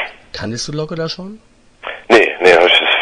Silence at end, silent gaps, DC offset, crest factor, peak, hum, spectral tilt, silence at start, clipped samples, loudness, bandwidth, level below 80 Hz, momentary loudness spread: 0 s; none; under 0.1%; 14 dB; 0 dBFS; none; -3.5 dB/octave; 0 s; 0.2%; -12 LUFS; 10.5 kHz; -48 dBFS; 20 LU